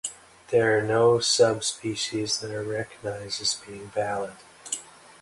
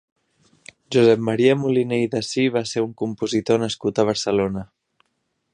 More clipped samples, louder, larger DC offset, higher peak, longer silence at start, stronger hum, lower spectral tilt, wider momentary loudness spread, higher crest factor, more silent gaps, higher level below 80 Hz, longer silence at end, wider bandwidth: neither; second, -25 LUFS vs -20 LUFS; neither; second, -8 dBFS vs -4 dBFS; second, 0.05 s vs 0.9 s; neither; second, -3 dB/octave vs -5.5 dB/octave; first, 13 LU vs 8 LU; about the same, 18 dB vs 18 dB; neither; second, -62 dBFS vs -56 dBFS; second, 0.3 s vs 0.9 s; about the same, 11.5 kHz vs 10.5 kHz